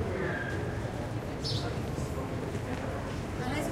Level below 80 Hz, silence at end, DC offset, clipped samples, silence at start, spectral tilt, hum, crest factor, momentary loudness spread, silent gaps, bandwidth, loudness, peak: -44 dBFS; 0 s; under 0.1%; under 0.1%; 0 s; -6 dB/octave; none; 14 dB; 3 LU; none; 16 kHz; -35 LUFS; -20 dBFS